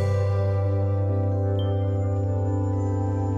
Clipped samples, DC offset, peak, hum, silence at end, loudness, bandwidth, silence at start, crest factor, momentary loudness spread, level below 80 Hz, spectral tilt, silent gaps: under 0.1%; under 0.1%; -14 dBFS; none; 0 s; -25 LUFS; 7 kHz; 0 s; 10 dB; 2 LU; -46 dBFS; -9.5 dB/octave; none